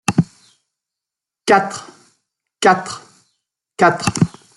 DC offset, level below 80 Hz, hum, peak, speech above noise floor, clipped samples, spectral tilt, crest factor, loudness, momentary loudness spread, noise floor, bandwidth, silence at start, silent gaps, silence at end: under 0.1%; -54 dBFS; none; 0 dBFS; 70 dB; under 0.1%; -5 dB/octave; 18 dB; -17 LUFS; 17 LU; -85 dBFS; 12 kHz; 0.1 s; none; 0.3 s